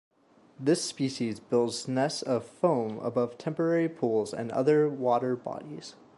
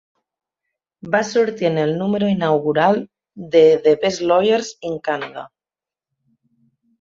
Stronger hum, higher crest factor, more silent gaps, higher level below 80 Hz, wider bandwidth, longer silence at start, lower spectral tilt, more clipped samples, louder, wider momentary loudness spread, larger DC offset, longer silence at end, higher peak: neither; about the same, 18 dB vs 18 dB; neither; second, -74 dBFS vs -62 dBFS; first, 11.5 kHz vs 7.6 kHz; second, 0.6 s vs 1.05 s; about the same, -5.5 dB/octave vs -5.5 dB/octave; neither; second, -29 LUFS vs -18 LUFS; second, 8 LU vs 13 LU; neither; second, 0.25 s vs 1.55 s; second, -12 dBFS vs -2 dBFS